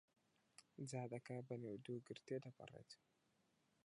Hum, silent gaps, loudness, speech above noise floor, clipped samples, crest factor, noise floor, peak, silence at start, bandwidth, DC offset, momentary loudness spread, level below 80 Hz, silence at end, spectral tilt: none; none; -53 LUFS; 31 dB; under 0.1%; 18 dB; -83 dBFS; -36 dBFS; 0.6 s; 11 kHz; under 0.1%; 15 LU; under -90 dBFS; 0.9 s; -6 dB/octave